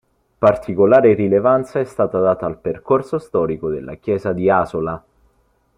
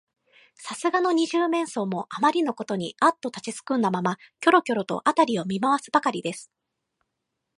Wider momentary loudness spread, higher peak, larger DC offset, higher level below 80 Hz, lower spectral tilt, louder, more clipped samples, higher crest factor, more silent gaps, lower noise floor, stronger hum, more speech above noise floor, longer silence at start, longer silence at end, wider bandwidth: about the same, 12 LU vs 11 LU; about the same, -2 dBFS vs -4 dBFS; neither; first, -50 dBFS vs -74 dBFS; first, -9 dB/octave vs -5 dB/octave; first, -17 LUFS vs -24 LUFS; neither; about the same, 16 dB vs 20 dB; neither; second, -61 dBFS vs -81 dBFS; neither; second, 44 dB vs 57 dB; second, 0.4 s vs 0.6 s; second, 0.8 s vs 1.15 s; about the same, 11 kHz vs 11.5 kHz